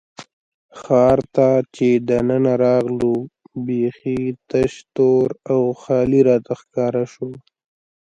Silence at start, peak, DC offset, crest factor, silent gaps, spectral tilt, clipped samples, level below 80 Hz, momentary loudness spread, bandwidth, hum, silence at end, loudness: 0.2 s; -2 dBFS; under 0.1%; 16 dB; 0.33-0.69 s; -8 dB/octave; under 0.1%; -50 dBFS; 10 LU; 8.2 kHz; none; 0.65 s; -18 LUFS